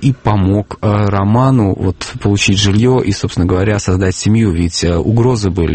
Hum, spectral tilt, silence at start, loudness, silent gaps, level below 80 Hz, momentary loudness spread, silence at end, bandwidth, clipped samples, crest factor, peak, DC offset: none; -6 dB/octave; 0 s; -13 LUFS; none; -30 dBFS; 5 LU; 0 s; 8.8 kHz; under 0.1%; 12 dB; 0 dBFS; under 0.1%